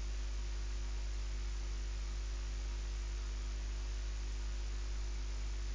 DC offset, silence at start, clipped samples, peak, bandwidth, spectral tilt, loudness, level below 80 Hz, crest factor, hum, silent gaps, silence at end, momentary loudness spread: under 0.1%; 0 s; under 0.1%; -32 dBFS; 7.6 kHz; -4 dB/octave; -43 LUFS; -40 dBFS; 6 dB; 50 Hz at -40 dBFS; none; 0 s; 0 LU